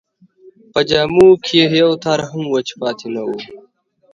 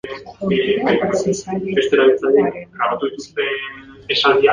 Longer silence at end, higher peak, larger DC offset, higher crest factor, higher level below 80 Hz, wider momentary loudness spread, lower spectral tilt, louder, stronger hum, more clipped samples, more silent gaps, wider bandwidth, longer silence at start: first, 0.55 s vs 0 s; about the same, 0 dBFS vs -2 dBFS; neither; about the same, 16 dB vs 16 dB; about the same, -52 dBFS vs -52 dBFS; about the same, 14 LU vs 12 LU; about the same, -5.5 dB/octave vs -4.5 dB/octave; first, -15 LUFS vs -18 LUFS; neither; neither; neither; second, 8 kHz vs 9.6 kHz; first, 0.75 s vs 0.05 s